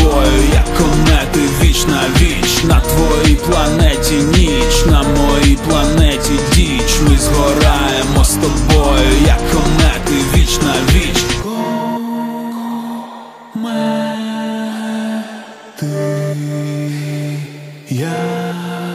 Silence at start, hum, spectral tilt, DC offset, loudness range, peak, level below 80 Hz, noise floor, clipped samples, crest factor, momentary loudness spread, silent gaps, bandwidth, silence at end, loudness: 0 s; none; -4.5 dB/octave; under 0.1%; 9 LU; 0 dBFS; -16 dBFS; -32 dBFS; under 0.1%; 12 dB; 11 LU; none; 15.5 kHz; 0 s; -13 LUFS